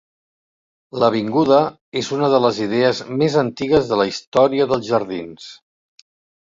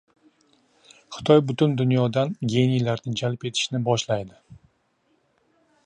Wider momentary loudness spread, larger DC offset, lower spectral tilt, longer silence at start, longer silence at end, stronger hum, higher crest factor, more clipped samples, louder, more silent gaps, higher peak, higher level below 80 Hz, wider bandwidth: first, 13 LU vs 10 LU; neither; about the same, -6 dB/octave vs -6 dB/octave; second, 0.95 s vs 1.1 s; second, 0.95 s vs 1.3 s; neither; about the same, 18 dB vs 22 dB; neither; first, -18 LUFS vs -23 LUFS; first, 1.81-1.92 s, 4.27-4.32 s vs none; about the same, -2 dBFS vs -4 dBFS; first, -54 dBFS vs -60 dBFS; second, 7.8 kHz vs 9.6 kHz